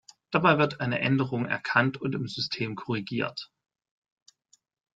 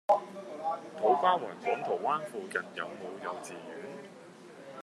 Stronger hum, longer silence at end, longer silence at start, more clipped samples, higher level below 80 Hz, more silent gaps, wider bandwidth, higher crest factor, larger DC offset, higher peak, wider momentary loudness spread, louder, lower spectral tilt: neither; first, 1.5 s vs 0 s; first, 0.3 s vs 0.1 s; neither; first, -66 dBFS vs under -90 dBFS; neither; second, 7.8 kHz vs 13 kHz; about the same, 24 dB vs 22 dB; neither; first, -6 dBFS vs -12 dBFS; second, 10 LU vs 20 LU; first, -27 LUFS vs -33 LUFS; first, -6.5 dB/octave vs -4.5 dB/octave